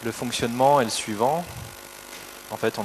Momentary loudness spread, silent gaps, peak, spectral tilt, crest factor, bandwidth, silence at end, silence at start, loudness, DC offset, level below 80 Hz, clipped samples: 19 LU; none; -6 dBFS; -4 dB/octave; 18 dB; 13.5 kHz; 0 s; 0 s; -23 LUFS; under 0.1%; -56 dBFS; under 0.1%